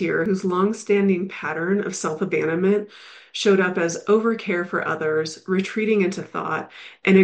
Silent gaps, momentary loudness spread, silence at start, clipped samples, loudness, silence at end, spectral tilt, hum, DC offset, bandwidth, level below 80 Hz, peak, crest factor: none; 7 LU; 0 s; under 0.1%; -22 LUFS; 0 s; -5.5 dB/octave; none; under 0.1%; 9.2 kHz; -68 dBFS; -4 dBFS; 18 dB